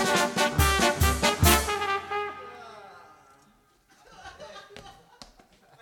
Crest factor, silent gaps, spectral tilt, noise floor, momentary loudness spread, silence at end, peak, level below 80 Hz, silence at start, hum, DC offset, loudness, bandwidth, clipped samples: 24 dB; none; -3.5 dB/octave; -62 dBFS; 24 LU; 0.9 s; -4 dBFS; -36 dBFS; 0 s; none; under 0.1%; -24 LUFS; 18 kHz; under 0.1%